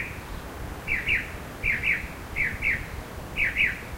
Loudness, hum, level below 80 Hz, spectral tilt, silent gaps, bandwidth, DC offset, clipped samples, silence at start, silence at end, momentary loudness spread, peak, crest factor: -26 LUFS; none; -40 dBFS; -4 dB/octave; none; 16 kHz; under 0.1%; under 0.1%; 0 s; 0 s; 14 LU; -12 dBFS; 18 dB